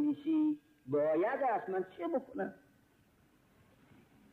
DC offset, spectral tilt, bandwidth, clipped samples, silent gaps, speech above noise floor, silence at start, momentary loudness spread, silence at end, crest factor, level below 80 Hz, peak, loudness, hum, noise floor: under 0.1%; -8.5 dB/octave; 4.1 kHz; under 0.1%; none; 34 dB; 0 s; 10 LU; 1.75 s; 12 dB; -78 dBFS; -24 dBFS; -35 LUFS; none; -69 dBFS